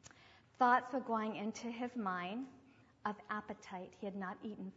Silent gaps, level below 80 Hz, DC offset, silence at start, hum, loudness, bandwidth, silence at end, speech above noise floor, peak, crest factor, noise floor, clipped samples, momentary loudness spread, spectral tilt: none; -80 dBFS; under 0.1%; 0.05 s; none; -40 LUFS; 7.6 kHz; 0.05 s; 25 dB; -18 dBFS; 22 dB; -64 dBFS; under 0.1%; 16 LU; -4 dB/octave